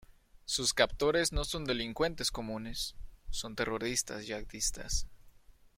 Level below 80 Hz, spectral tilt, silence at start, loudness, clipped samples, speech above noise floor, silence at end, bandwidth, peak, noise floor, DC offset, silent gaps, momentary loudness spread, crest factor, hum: -44 dBFS; -2.5 dB/octave; 0.45 s; -34 LUFS; under 0.1%; 24 dB; 0.25 s; 16.5 kHz; -10 dBFS; -58 dBFS; under 0.1%; none; 11 LU; 26 dB; none